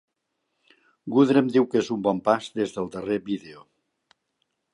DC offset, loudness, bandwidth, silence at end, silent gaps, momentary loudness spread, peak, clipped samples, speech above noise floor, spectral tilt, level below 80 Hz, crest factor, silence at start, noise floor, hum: under 0.1%; -24 LUFS; 11 kHz; 1.2 s; none; 13 LU; -6 dBFS; under 0.1%; 55 dB; -6.5 dB/octave; -66 dBFS; 20 dB; 1.05 s; -78 dBFS; none